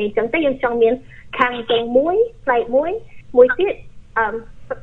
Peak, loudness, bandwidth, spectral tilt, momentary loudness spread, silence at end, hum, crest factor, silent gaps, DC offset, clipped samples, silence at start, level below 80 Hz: 0 dBFS; -18 LUFS; 4.1 kHz; -6.5 dB/octave; 14 LU; 0 s; none; 18 dB; none; under 0.1%; under 0.1%; 0 s; -44 dBFS